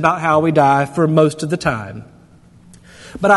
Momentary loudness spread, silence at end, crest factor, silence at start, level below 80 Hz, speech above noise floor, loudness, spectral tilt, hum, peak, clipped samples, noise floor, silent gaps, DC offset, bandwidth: 19 LU; 0 s; 16 dB; 0 s; -48 dBFS; 31 dB; -15 LUFS; -6.5 dB/octave; none; 0 dBFS; under 0.1%; -46 dBFS; none; under 0.1%; 12 kHz